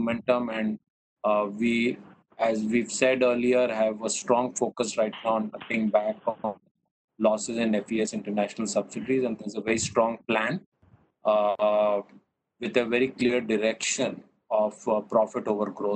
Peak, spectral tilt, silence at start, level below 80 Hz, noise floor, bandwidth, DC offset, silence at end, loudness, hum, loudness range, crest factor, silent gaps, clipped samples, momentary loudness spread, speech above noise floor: -8 dBFS; -4 dB/octave; 0 s; -64 dBFS; -61 dBFS; 9.2 kHz; under 0.1%; 0 s; -26 LUFS; none; 3 LU; 18 dB; 0.90-1.16 s, 6.71-6.75 s, 6.91-7.08 s, 10.66-10.72 s; under 0.1%; 8 LU; 35 dB